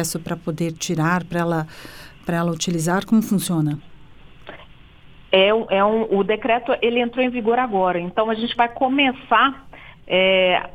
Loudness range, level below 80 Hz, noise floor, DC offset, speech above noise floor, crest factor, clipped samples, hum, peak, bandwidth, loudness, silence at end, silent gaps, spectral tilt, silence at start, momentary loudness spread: 4 LU; -50 dBFS; -45 dBFS; under 0.1%; 25 dB; 20 dB; under 0.1%; none; 0 dBFS; 19.5 kHz; -20 LUFS; 0 s; none; -5 dB/octave; 0 s; 9 LU